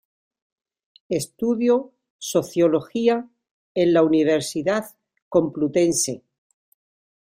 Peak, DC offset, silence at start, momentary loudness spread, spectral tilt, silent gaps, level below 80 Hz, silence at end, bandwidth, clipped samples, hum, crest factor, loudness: -6 dBFS; under 0.1%; 1.1 s; 10 LU; -4.5 dB/octave; 2.10-2.19 s, 3.51-3.75 s, 5.22-5.31 s; -64 dBFS; 1.05 s; 16 kHz; under 0.1%; none; 18 dB; -21 LUFS